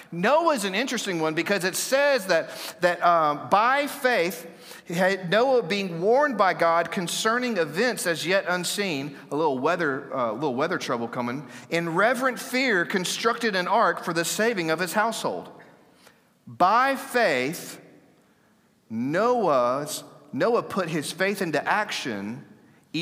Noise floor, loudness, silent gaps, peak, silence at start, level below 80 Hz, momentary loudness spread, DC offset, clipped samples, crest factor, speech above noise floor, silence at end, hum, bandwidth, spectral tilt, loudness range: -62 dBFS; -24 LUFS; none; -6 dBFS; 0 s; -78 dBFS; 10 LU; under 0.1%; under 0.1%; 18 dB; 38 dB; 0 s; none; 16 kHz; -3.5 dB/octave; 4 LU